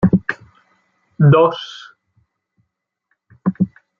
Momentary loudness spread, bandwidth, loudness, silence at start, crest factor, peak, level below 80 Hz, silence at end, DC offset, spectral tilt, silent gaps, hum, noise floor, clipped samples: 21 LU; 6.8 kHz; -16 LUFS; 0 s; 16 dB; -2 dBFS; -50 dBFS; 0.3 s; under 0.1%; -9 dB/octave; none; none; -74 dBFS; under 0.1%